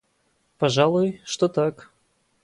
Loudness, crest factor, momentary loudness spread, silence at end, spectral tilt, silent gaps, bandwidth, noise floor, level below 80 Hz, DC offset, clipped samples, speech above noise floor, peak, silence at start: -22 LUFS; 20 dB; 6 LU; 0.7 s; -5.5 dB/octave; none; 11.5 kHz; -68 dBFS; -64 dBFS; under 0.1%; under 0.1%; 47 dB; -4 dBFS; 0.6 s